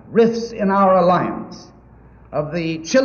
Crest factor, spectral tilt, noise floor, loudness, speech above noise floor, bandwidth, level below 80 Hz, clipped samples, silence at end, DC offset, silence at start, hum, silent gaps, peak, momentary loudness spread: 16 dB; -6 dB/octave; -45 dBFS; -18 LUFS; 28 dB; 7 kHz; -50 dBFS; under 0.1%; 0 s; under 0.1%; 0.05 s; none; none; -2 dBFS; 14 LU